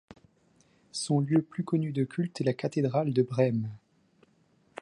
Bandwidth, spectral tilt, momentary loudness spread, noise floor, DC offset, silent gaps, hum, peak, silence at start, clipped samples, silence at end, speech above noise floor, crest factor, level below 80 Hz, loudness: 11.5 kHz; -7 dB/octave; 10 LU; -67 dBFS; under 0.1%; none; none; -12 dBFS; 0.95 s; under 0.1%; 1.05 s; 39 dB; 18 dB; -72 dBFS; -29 LUFS